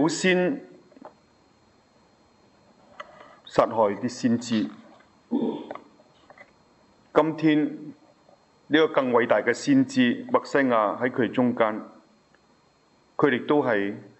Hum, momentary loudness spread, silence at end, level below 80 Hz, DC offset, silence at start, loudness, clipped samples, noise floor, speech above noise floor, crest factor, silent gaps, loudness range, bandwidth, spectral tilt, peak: none; 16 LU; 0.15 s; -68 dBFS; under 0.1%; 0 s; -24 LUFS; under 0.1%; -62 dBFS; 39 dB; 22 dB; none; 7 LU; 8.2 kHz; -5.5 dB/octave; -4 dBFS